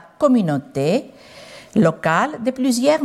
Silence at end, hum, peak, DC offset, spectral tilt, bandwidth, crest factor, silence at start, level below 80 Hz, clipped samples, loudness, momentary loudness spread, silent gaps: 0 s; none; -4 dBFS; under 0.1%; -6 dB/octave; 14.5 kHz; 16 dB; 0.2 s; -60 dBFS; under 0.1%; -19 LUFS; 7 LU; none